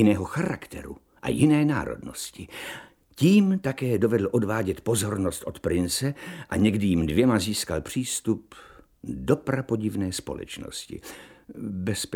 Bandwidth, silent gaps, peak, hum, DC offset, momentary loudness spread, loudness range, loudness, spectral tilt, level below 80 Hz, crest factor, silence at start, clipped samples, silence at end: 17.5 kHz; none; -6 dBFS; none; under 0.1%; 17 LU; 6 LU; -26 LUFS; -5.5 dB/octave; -50 dBFS; 18 dB; 0 s; under 0.1%; 0 s